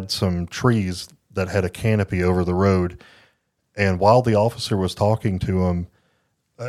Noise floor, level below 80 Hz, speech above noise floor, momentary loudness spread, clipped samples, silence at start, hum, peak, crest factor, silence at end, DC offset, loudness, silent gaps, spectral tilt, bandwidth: -68 dBFS; -44 dBFS; 48 dB; 12 LU; under 0.1%; 0 s; none; -2 dBFS; 20 dB; 0 s; under 0.1%; -21 LUFS; none; -6.5 dB/octave; 14 kHz